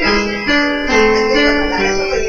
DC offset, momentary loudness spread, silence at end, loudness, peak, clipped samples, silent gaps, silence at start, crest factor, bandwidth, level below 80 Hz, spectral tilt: under 0.1%; 3 LU; 0 s; -13 LUFS; 0 dBFS; under 0.1%; none; 0 s; 14 dB; 7.6 kHz; -30 dBFS; -3.5 dB/octave